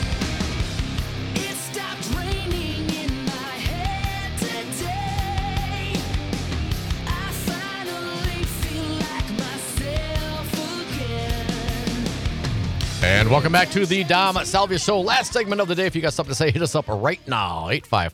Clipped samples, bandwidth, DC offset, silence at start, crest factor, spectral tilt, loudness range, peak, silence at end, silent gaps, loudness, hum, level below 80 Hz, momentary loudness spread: under 0.1%; 19 kHz; under 0.1%; 0 s; 20 dB; -4.5 dB/octave; 7 LU; -4 dBFS; 0 s; none; -23 LUFS; none; -34 dBFS; 9 LU